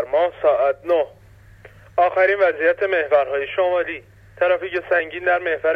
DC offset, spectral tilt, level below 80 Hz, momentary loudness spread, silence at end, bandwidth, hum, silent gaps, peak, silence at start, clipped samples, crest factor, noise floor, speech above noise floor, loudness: under 0.1%; -6 dB/octave; -56 dBFS; 6 LU; 0 s; 5 kHz; none; none; -4 dBFS; 0 s; under 0.1%; 14 dB; -46 dBFS; 27 dB; -19 LUFS